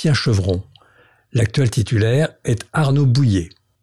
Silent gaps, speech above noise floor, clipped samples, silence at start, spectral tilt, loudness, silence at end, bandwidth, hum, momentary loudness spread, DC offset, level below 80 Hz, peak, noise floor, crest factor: none; 37 dB; under 0.1%; 0 s; -6.5 dB/octave; -18 LUFS; 0.35 s; 12 kHz; none; 8 LU; 0.5%; -44 dBFS; -8 dBFS; -54 dBFS; 10 dB